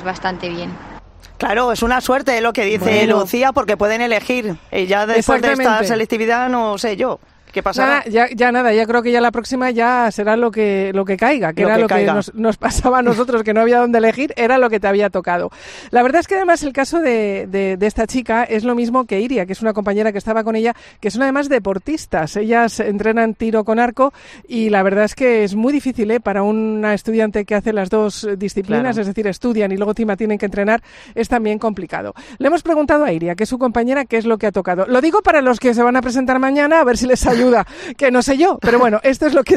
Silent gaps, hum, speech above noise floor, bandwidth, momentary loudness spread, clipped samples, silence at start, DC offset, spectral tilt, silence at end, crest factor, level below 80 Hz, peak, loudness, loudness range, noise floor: none; none; 22 dB; 14 kHz; 7 LU; under 0.1%; 0 s; under 0.1%; -5 dB/octave; 0 s; 14 dB; -40 dBFS; -2 dBFS; -16 LUFS; 4 LU; -38 dBFS